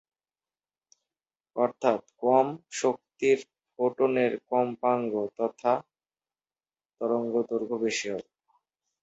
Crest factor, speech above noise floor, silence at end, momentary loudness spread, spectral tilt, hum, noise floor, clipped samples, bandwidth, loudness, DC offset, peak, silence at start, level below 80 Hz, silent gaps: 20 dB; over 63 dB; 0.8 s; 7 LU; -4.5 dB/octave; none; under -90 dBFS; under 0.1%; 8.2 kHz; -28 LUFS; under 0.1%; -8 dBFS; 1.55 s; -76 dBFS; none